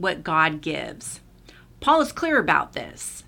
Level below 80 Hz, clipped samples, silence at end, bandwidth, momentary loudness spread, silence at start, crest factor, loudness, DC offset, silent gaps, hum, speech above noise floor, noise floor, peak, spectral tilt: -52 dBFS; under 0.1%; 0.05 s; 18 kHz; 15 LU; 0 s; 20 dB; -22 LUFS; under 0.1%; none; none; 26 dB; -49 dBFS; -4 dBFS; -3.5 dB/octave